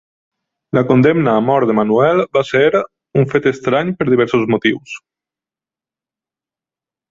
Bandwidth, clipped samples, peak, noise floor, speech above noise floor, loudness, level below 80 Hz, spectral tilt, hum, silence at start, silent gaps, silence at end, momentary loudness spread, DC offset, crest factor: 7.6 kHz; under 0.1%; 0 dBFS; -90 dBFS; 76 dB; -14 LUFS; -54 dBFS; -7.5 dB/octave; none; 0.75 s; none; 2.15 s; 8 LU; under 0.1%; 16 dB